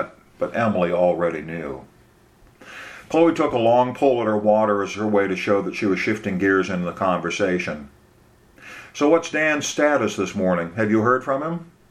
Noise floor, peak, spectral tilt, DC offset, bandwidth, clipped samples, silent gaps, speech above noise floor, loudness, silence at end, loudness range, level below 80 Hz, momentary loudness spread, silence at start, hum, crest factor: -54 dBFS; -4 dBFS; -5.5 dB/octave; under 0.1%; 13 kHz; under 0.1%; none; 33 dB; -21 LUFS; 0.25 s; 4 LU; -58 dBFS; 15 LU; 0 s; none; 18 dB